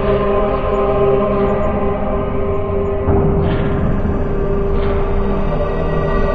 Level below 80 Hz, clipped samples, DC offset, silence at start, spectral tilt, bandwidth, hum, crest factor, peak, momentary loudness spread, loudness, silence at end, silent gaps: -20 dBFS; under 0.1%; under 0.1%; 0 s; -10 dB/octave; 4.9 kHz; none; 14 dB; -2 dBFS; 4 LU; -17 LUFS; 0 s; none